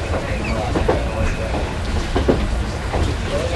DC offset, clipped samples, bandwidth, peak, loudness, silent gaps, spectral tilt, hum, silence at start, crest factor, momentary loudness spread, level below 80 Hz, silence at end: under 0.1%; under 0.1%; 12 kHz; 0 dBFS; -21 LUFS; none; -6 dB/octave; none; 0 s; 18 dB; 4 LU; -24 dBFS; 0 s